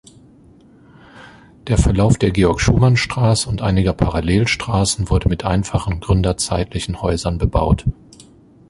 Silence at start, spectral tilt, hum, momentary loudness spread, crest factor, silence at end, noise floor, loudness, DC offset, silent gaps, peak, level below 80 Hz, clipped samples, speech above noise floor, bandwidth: 1.15 s; -5.5 dB/octave; none; 7 LU; 16 dB; 0.8 s; -47 dBFS; -17 LUFS; under 0.1%; none; -2 dBFS; -26 dBFS; under 0.1%; 31 dB; 11.5 kHz